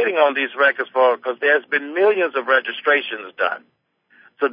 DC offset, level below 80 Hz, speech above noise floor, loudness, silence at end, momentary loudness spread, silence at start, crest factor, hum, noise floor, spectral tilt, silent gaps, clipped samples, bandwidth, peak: under 0.1%; -76 dBFS; 35 dB; -19 LUFS; 0 s; 6 LU; 0 s; 18 dB; none; -54 dBFS; -7 dB/octave; none; under 0.1%; 5.2 kHz; -2 dBFS